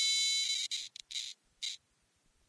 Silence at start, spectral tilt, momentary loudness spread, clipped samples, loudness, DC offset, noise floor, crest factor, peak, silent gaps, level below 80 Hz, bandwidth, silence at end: 0 s; 6 dB/octave; 14 LU; under 0.1%; -34 LUFS; under 0.1%; -75 dBFS; 16 dB; -20 dBFS; none; -80 dBFS; 11 kHz; 0.7 s